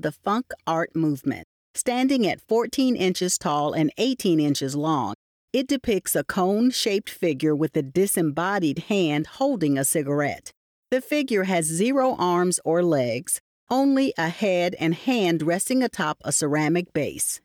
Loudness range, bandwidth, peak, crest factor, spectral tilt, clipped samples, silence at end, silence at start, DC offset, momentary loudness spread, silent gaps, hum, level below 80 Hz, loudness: 1 LU; 19.5 kHz; -12 dBFS; 12 dB; -4.5 dB/octave; under 0.1%; 0.05 s; 0.05 s; under 0.1%; 6 LU; 1.44-1.74 s, 5.15-5.48 s, 10.57-10.83 s, 13.40-13.67 s; none; -62 dBFS; -23 LUFS